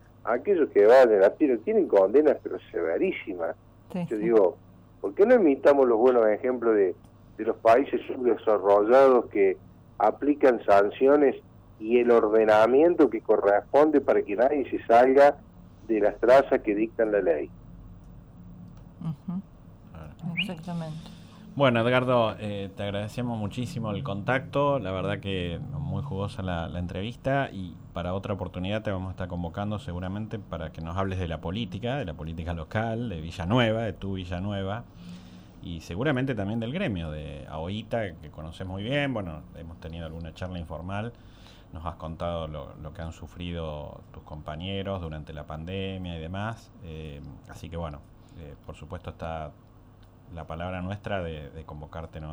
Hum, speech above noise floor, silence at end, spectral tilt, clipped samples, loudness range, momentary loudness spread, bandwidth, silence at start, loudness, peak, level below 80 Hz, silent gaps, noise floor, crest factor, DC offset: none; 27 dB; 0 s; -7.5 dB/octave; under 0.1%; 15 LU; 20 LU; over 20 kHz; 0.25 s; -25 LUFS; -10 dBFS; -52 dBFS; none; -52 dBFS; 16 dB; under 0.1%